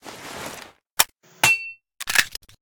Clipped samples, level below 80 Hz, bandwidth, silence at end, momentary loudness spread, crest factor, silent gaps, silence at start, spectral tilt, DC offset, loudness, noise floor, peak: under 0.1%; -56 dBFS; over 20 kHz; 0.25 s; 18 LU; 24 dB; 0.91-0.97 s; 0.05 s; 0 dB/octave; under 0.1%; -20 LUFS; -42 dBFS; 0 dBFS